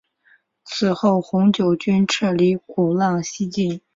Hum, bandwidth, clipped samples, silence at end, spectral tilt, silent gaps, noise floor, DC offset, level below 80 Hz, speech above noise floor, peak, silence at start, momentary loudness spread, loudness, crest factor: none; 7.8 kHz; under 0.1%; 0.2 s; -6 dB/octave; none; -58 dBFS; under 0.1%; -60 dBFS; 40 dB; -4 dBFS; 0.65 s; 6 LU; -19 LUFS; 16 dB